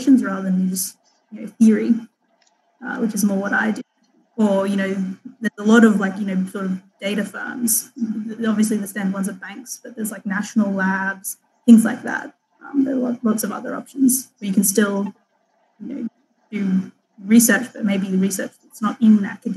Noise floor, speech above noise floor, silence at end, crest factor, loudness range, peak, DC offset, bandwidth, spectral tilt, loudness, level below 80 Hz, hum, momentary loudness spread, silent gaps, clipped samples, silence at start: -64 dBFS; 45 dB; 0 s; 20 dB; 4 LU; 0 dBFS; under 0.1%; 13 kHz; -5 dB/octave; -20 LUFS; -84 dBFS; none; 16 LU; none; under 0.1%; 0 s